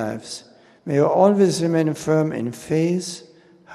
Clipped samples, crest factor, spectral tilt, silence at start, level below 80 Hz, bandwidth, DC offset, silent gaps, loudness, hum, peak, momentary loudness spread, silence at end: under 0.1%; 18 dB; -6 dB/octave; 0 s; -62 dBFS; 13.5 kHz; under 0.1%; none; -20 LUFS; none; -2 dBFS; 19 LU; 0 s